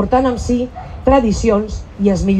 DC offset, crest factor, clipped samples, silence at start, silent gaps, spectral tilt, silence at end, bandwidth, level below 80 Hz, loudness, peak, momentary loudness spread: under 0.1%; 14 dB; under 0.1%; 0 s; none; -7 dB/octave; 0 s; 9.4 kHz; -28 dBFS; -16 LUFS; -2 dBFS; 8 LU